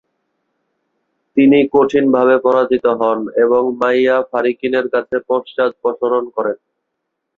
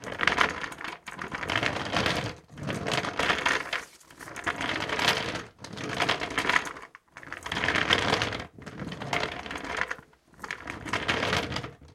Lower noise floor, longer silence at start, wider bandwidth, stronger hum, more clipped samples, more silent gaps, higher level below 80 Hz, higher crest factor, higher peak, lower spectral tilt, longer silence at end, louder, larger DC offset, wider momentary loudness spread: first, -75 dBFS vs -52 dBFS; first, 1.35 s vs 0 s; second, 6.6 kHz vs 16.5 kHz; neither; neither; neither; second, -58 dBFS vs -52 dBFS; second, 14 dB vs 28 dB; about the same, -2 dBFS vs -2 dBFS; first, -7 dB/octave vs -3 dB/octave; first, 0.8 s vs 0 s; first, -15 LUFS vs -29 LUFS; neither; second, 8 LU vs 15 LU